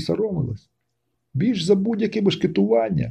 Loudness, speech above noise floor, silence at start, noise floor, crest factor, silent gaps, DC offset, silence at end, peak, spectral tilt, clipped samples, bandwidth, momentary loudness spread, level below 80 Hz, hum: -21 LUFS; 55 dB; 0 s; -75 dBFS; 16 dB; none; under 0.1%; 0 s; -6 dBFS; -7 dB/octave; under 0.1%; 10.5 kHz; 10 LU; -52 dBFS; none